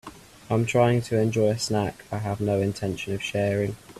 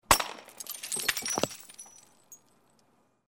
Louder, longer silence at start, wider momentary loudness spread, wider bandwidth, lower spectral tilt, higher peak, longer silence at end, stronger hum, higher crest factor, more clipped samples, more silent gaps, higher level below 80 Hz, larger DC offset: first, -25 LUFS vs -30 LUFS; about the same, 0.05 s vs 0.1 s; second, 9 LU vs 23 LU; second, 14 kHz vs 19 kHz; first, -6 dB/octave vs -1 dB/octave; second, -8 dBFS vs -4 dBFS; second, 0 s vs 0.9 s; neither; second, 18 dB vs 30 dB; neither; neither; about the same, -54 dBFS vs -54 dBFS; neither